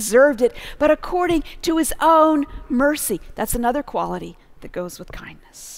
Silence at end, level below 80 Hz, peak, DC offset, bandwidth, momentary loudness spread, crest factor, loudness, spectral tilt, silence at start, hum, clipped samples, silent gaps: 0 s; -38 dBFS; -4 dBFS; under 0.1%; 16.5 kHz; 20 LU; 16 dB; -19 LUFS; -4 dB/octave; 0 s; none; under 0.1%; none